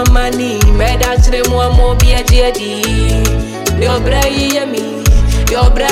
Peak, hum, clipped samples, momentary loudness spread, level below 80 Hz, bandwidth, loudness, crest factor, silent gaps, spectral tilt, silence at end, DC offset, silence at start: 0 dBFS; none; under 0.1%; 5 LU; -12 dBFS; 16 kHz; -12 LUFS; 10 dB; none; -4.5 dB/octave; 0 s; under 0.1%; 0 s